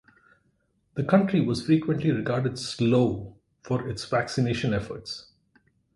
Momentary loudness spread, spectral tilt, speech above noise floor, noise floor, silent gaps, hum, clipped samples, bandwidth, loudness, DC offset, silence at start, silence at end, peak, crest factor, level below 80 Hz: 14 LU; -6.5 dB/octave; 45 dB; -70 dBFS; none; none; under 0.1%; 11.5 kHz; -26 LUFS; under 0.1%; 0.95 s; 0.75 s; -6 dBFS; 20 dB; -54 dBFS